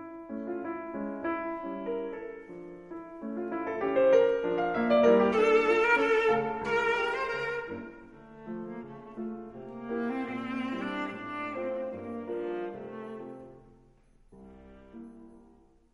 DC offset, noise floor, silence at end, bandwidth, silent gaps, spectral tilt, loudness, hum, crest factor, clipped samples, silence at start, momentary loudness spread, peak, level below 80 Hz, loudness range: under 0.1%; -60 dBFS; 0.55 s; 10.5 kHz; none; -6 dB/octave; -29 LUFS; none; 20 dB; under 0.1%; 0 s; 21 LU; -10 dBFS; -62 dBFS; 14 LU